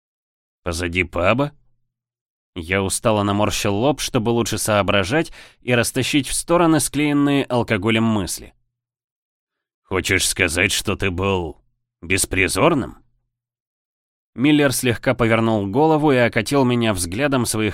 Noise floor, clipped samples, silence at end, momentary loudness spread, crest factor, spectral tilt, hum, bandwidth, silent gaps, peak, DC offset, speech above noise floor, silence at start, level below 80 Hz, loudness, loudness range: -71 dBFS; under 0.1%; 0 s; 8 LU; 18 dB; -4.5 dB/octave; none; 16.5 kHz; 2.21-2.53 s, 9.04-9.47 s, 9.74-9.82 s, 13.60-14.33 s; -2 dBFS; under 0.1%; 52 dB; 0.65 s; -42 dBFS; -19 LUFS; 4 LU